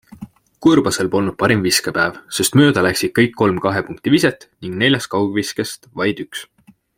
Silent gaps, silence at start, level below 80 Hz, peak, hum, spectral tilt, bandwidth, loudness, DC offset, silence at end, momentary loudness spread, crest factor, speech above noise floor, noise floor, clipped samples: none; 0.2 s; -52 dBFS; 0 dBFS; none; -4.5 dB/octave; 16.5 kHz; -17 LUFS; under 0.1%; 0.55 s; 11 LU; 16 dB; 21 dB; -38 dBFS; under 0.1%